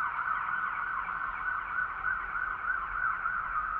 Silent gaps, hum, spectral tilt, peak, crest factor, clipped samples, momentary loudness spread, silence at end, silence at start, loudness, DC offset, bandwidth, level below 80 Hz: none; none; -0.5 dB/octave; -20 dBFS; 12 dB; under 0.1%; 3 LU; 0 s; 0 s; -32 LUFS; under 0.1%; 4.8 kHz; -54 dBFS